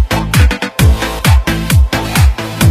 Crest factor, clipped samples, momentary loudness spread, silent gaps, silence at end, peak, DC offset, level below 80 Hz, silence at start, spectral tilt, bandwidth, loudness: 10 dB; under 0.1%; 2 LU; none; 0 s; 0 dBFS; under 0.1%; -14 dBFS; 0 s; -5 dB/octave; 15.5 kHz; -12 LUFS